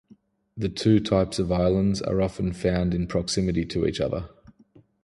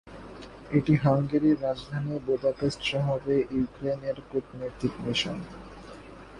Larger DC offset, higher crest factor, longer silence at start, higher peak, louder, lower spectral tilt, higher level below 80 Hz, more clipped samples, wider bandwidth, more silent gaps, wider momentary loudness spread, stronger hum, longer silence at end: neither; about the same, 16 dB vs 18 dB; first, 0.55 s vs 0.05 s; about the same, -8 dBFS vs -10 dBFS; first, -25 LUFS vs -28 LUFS; about the same, -6.5 dB/octave vs -6.5 dB/octave; first, -42 dBFS vs -52 dBFS; neither; about the same, 11.5 kHz vs 10.5 kHz; neither; second, 9 LU vs 21 LU; neither; first, 0.75 s vs 0 s